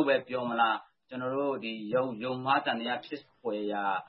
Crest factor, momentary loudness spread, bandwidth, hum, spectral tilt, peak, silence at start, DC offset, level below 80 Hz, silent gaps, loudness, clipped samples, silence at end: 20 dB; 9 LU; 5.8 kHz; none; -9 dB/octave; -12 dBFS; 0 s; under 0.1%; -80 dBFS; none; -31 LUFS; under 0.1%; 0 s